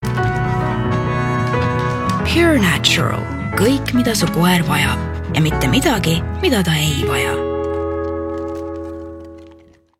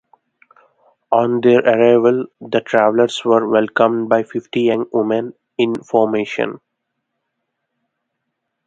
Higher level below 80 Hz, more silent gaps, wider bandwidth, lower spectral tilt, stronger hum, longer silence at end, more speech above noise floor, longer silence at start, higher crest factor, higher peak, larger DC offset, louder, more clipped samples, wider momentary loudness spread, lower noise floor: first, -34 dBFS vs -64 dBFS; neither; first, 17 kHz vs 8.8 kHz; about the same, -5 dB/octave vs -6 dB/octave; neither; second, 0.45 s vs 2.1 s; second, 31 dB vs 60 dB; second, 0 s vs 1.1 s; about the same, 16 dB vs 18 dB; about the same, 0 dBFS vs 0 dBFS; neither; about the same, -17 LUFS vs -16 LUFS; neither; about the same, 11 LU vs 9 LU; second, -46 dBFS vs -75 dBFS